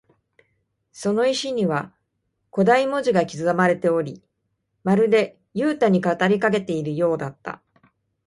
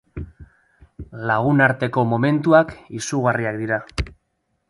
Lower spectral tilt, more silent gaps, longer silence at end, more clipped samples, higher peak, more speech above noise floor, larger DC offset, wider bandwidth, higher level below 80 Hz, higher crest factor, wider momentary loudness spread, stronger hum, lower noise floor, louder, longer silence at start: about the same, -6 dB/octave vs -6.5 dB/octave; neither; about the same, 0.7 s vs 0.6 s; neither; second, -4 dBFS vs 0 dBFS; about the same, 54 dB vs 52 dB; neither; about the same, 11.5 kHz vs 11.5 kHz; second, -64 dBFS vs -40 dBFS; about the same, 18 dB vs 20 dB; second, 13 LU vs 18 LU; neither; about the same, -74 dBFS vs -71 dBFS; about the same, -21 LUFS vs -20 LUFS; first, 0.95 s vs 0.15 s